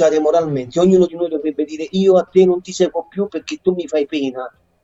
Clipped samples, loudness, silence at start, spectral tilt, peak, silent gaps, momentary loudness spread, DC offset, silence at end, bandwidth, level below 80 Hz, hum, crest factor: under 0.1%; -17 LUFS; 0 s; -6.5 dB/octave; -2 dBFS; none; 10 LU; under 0.1%; 0.35 s; 8 kHz; -54 dBFS; none; 14 dB